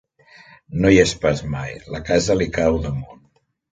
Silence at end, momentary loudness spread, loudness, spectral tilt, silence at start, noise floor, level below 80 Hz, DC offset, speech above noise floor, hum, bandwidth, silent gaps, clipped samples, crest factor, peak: 0.6 s; 16 LU; -19 LUFS; -5.5 dB/octave; 0.7 s; -61 dBFS; -38 dBFS; under 0.1%; 43 dB; none; 9.6 kHz; none; under 0.1%; 20 dB; 0 dBFS